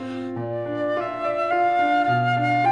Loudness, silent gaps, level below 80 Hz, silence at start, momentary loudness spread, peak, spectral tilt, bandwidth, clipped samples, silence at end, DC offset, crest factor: -22 LUFS; none; -62 dBFS; 0 s; 9 LU; -10 dBFS; -7.5 dB/octave; 9.8 kHz; under 0.1%; 0 s; 0.1%; 12 dB